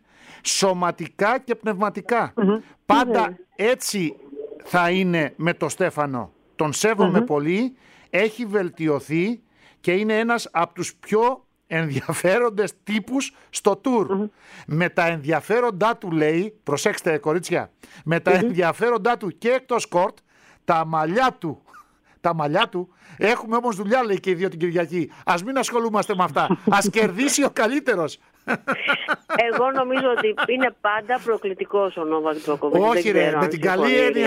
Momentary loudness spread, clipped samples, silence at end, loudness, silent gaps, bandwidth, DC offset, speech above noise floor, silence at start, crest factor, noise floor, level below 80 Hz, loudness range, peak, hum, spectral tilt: 8 LU; under 0.1%; 0 s; -22 LUFS; none; 16 kHz; under 0.1%; 30 dB; 0.3 s; 18 dB; -51 dBFS; -64 dBFS; 2 LU; -4 dBFS; none; -4.5 dB/octave